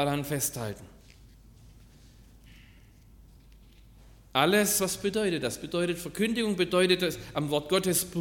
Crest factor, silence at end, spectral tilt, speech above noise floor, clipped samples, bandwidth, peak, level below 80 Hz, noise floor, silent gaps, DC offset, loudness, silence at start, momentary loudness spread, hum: 22 dB; 0 s; -3.5 dB/octave; 27 dB; under 0.1%; 17.5 kHz; -10 dBFS; -56 dBFS; -54 dBFS; none; under 0.1%; -28 LUFS; 0 s; 8 LU; none